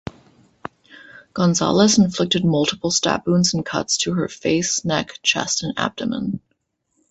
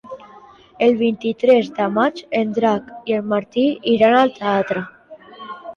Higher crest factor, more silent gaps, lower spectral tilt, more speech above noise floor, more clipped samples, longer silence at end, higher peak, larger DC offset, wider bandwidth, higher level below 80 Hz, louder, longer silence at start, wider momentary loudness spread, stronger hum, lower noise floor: about the same, 18 dB vs 16 dB; neither; second, -4 dB/octave vs -6.5 dB/octave; first, 51 dB vs 28 dB; neither; first, 0.7 s vs 0 s; about the same, -2 dBFS vs -4 dBFS; neither; first, 8.4 kHz vs 7 kHz; first, -52 dBFS vs -62 dBFS; about the same, -19 LUFS vs -18 LUFS; about the same, 0.05 s vs 0.05 s; second, 17 LU vs 20 LU; neither; first, -71 dBFS vs -45 dBFS